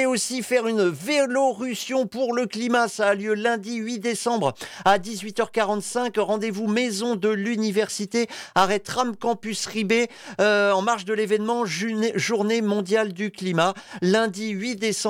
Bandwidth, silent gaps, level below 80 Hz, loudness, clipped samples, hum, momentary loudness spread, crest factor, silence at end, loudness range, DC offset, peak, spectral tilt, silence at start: 16.5 kHz; none; -66 dBFS; -23 LUFS; under 0.1%; none; 6 LU; 16 dB; 0 s; 2 LU; under 0.1%; -8 dBFS; -4 dB/octave; 0 s